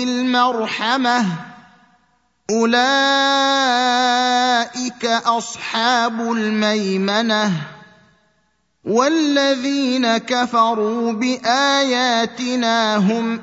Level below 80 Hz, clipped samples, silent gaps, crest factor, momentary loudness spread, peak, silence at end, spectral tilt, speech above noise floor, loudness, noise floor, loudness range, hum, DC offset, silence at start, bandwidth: -68 dBFS; under 0.1%; none; 16 dB; 6 LU; -2 dBFS; 0 s; -3.5 dB/octave; 48 dB; -17 LUFS; -65 dBFS; 3 LU; none; under 0.1%; 0 s; 8 kHz